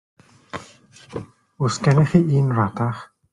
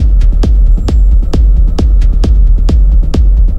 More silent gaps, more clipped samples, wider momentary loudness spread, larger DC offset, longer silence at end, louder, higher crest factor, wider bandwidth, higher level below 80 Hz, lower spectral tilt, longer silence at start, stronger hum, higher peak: neither; neither; first, 20 LU vs 1 LU; neither; first, 0.3 s vs 0 s; second, -19 LUFS vs -11 LUFS; first, 18 dB vs 6 dB; first, 10.5 kHz vs 5.8 kHz; second, -54 dBFS vs -6 dBFS; about the same, -7 dB/octave vs -8 dB/octave; first, 0.55 s vs 0 s; neither; about the same, -2 dBFS vs 0 dBFS